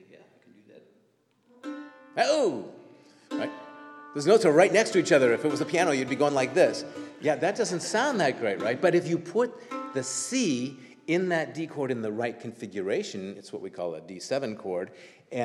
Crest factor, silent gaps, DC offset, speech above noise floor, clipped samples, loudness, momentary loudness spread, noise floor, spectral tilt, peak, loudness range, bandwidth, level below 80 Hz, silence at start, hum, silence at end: 22 dB; none; under 0.1%; 41 dB; under 0.1%; -27 LUFS; 18 LU; -67 dBFS; -4.5 dB/octave; -6 dBFS; 9 LU; 12.5 kHz; -82 dBFS; 0.75 s; none; 0 s